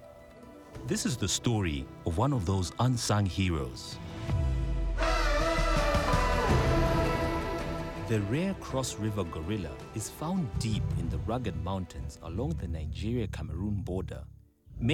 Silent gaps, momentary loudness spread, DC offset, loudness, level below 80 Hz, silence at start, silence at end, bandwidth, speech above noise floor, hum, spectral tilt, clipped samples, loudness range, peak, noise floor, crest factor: none; 12 LU; under 0.1%; -31 LUFS; -38 dBFS; 0 s; 0 s; 16.5 kHz; 19 dB; none; -5.5 dB/octave; under 0.1%; 6 LU; -14 dBFS; -50 dBFS; 16 dB